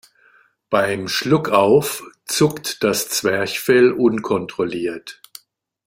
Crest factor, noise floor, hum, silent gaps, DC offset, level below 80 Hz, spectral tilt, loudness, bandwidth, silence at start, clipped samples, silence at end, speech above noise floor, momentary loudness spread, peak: 18 dB; -58 dBFS; none; none; under 0.1%; -58 dBFS; -4 dB/octave; -18 LUFS; 16.5 kHz; 0.7 s; under 0.1%; 0.75 s; 40 dB; 12 LU; -2 dBFS